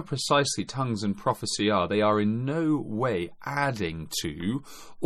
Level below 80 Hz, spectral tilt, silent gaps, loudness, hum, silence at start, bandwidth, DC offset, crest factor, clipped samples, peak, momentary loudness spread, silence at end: -56 dBFS; -4.5 dB/octave; none; -27 LUFS; none; 0 s; 14.5 kHz; under 0.1%; 18 dB; under 0.1%; -8 dBFS; 8 LU; 0 s